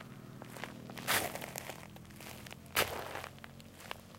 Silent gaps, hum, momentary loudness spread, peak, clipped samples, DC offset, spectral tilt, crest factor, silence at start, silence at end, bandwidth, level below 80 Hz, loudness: none; none; 18 LU; -14 dBFS; under 0.1%; under 0.1%; -2.5 dB/octave; 28 dB; 0 s; 0 s; 16.5 kHz; -66 dBFS; -39 LUFS